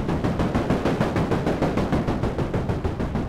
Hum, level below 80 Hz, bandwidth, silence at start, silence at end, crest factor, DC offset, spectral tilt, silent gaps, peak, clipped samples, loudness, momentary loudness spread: none; -34 dBFS; 15.5 kHz; 0 s; 0 s; 14 dB; under 0.1%; -7.5 dB/octave; none; -8 dBFS; under 0.1%; -24 LUFS; 3 LU